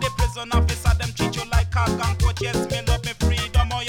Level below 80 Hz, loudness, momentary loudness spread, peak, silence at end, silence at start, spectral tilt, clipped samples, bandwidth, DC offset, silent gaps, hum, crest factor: -24 dBFS; -23 LUFS; 4 LU; -6 dBFS; 0 s; 0 s; -5 dB/octave; under 0.1%; 16.5 kHz; under 0.1%; none; none; 16 dB